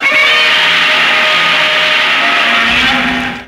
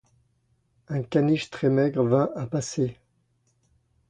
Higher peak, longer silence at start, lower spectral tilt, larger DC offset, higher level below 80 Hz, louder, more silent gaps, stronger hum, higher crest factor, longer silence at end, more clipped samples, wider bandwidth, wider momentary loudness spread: first, 0 dBFS vs -8 dBFS; second, 0 s vs 0.9 s; second, -1.5 dB/octave vs -7 dB/octave; neither; first, -40 dBFS vs -62 dBFS; first, -8 LUFS vs -25 LUFS; neither; neither; second, 10 dB vs 18 dB; second, 0 s vs 1.15 s; neither; first, 16 kHz vs 10 kHz; second, 2 LU vs 8 LU